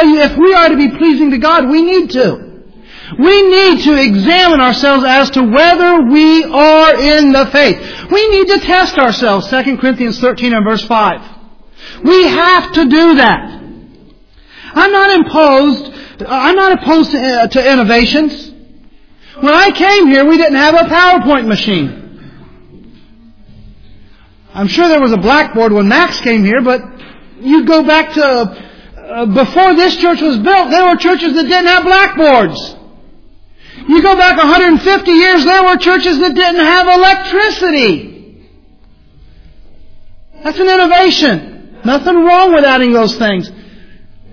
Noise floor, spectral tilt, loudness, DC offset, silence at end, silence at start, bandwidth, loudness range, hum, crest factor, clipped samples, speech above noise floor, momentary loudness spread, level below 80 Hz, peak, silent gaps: -41 dBFS; -5 dB/octave; -8 LUFS; under 0.1%; 0.05 s; 0 s; 5.4 kHz; 6 LU; none; 10 dB; 0.3%; 34 dB; 8 LU; -36 dBFS; 0 dBFS; none